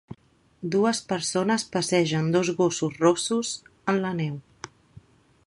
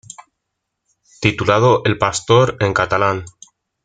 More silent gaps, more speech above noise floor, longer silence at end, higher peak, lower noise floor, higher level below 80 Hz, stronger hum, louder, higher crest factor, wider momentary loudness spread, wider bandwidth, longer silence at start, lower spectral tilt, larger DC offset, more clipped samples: neither; second, 34 dB vs 61 dB; about the same, 0.45 s vs 0.55 s; second, -6 dBFS vs 0 dBFS; second, -58 dBFS vs -77 dBFS; second, -64 dBFS vs -48 dBFS; neither; second, -25 LUFS vs -16 LUFS; about the same, 20 dB vs 18 dB; first, 13 LU vs 6 LU; first, 11.5 kHz vs 9.4 kHz; second, 0.1 s vs 1.2 s; about the same, -4.5 dB/octave vs -5 dB/octave; neither; neither